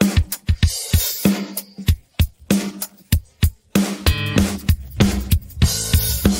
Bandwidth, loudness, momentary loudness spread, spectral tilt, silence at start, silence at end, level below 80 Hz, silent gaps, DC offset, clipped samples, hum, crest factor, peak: 16.5 kHz; -20 LUFS; 6 LU; -4.5 dB/octave; 0 s; 0 s; -26 dBFS; none; under 0.1%; under 0.1%; none; 18 dB; 0 dBFS